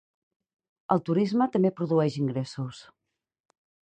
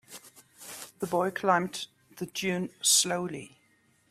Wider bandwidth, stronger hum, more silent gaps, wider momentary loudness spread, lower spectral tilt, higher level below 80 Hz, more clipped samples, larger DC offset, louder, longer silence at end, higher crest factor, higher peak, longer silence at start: second, 9.2 kHz vs 16 kHz; neither; neither; second, 12 LU vs 21 LU; first, -8 dB/octave vs -2.5 dB/octave; about the same, -70 dBFS vs -74 dBFS; neither; neither; about the same, -27 LUFS vs -28 LUFS; first, 1.15 s vs 0.65 s; about the same, 20 dB vs 22 dB; about the same, -10 dBFS vs -10 dBFS; first, 0.9 s vs 0.1 s